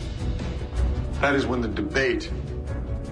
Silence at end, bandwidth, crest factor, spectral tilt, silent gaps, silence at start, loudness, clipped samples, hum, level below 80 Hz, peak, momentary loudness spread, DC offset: 0 s; 10 kHz; 16 dB; -6.5 dB/octave; none; 0 s; -26 LUFS; under 0.1%; none; -30 dBFS; -10 dBFS; 9 LU; under 0.1%